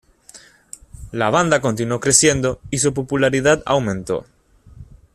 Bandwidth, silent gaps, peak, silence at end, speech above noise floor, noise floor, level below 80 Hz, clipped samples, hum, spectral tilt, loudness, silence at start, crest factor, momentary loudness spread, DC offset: 13.5 kHz; none; 0 dBFS; 0.3 s; 28 dB; -46 dBFS; -46 dBFS; under 0.1%; none; -3.5 dB/octave; -17 LUFS; 0.35 s; 20 dB; 13 LU; under 0.1%